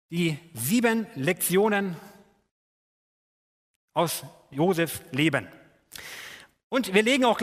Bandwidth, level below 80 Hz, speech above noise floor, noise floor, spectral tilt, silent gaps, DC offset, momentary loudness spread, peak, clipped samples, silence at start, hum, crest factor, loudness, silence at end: 16 kHz; -68 dBFS; over 65 dB; under -90 dBFS; -4.5 dB/octave; 2.51-3.88 s, 6.64-6.70 s; under 0.1%; 18 LU; -6 dBFS; under 0.1%; 0.1 s; none; 22 dB; -25 LUFS; 0 s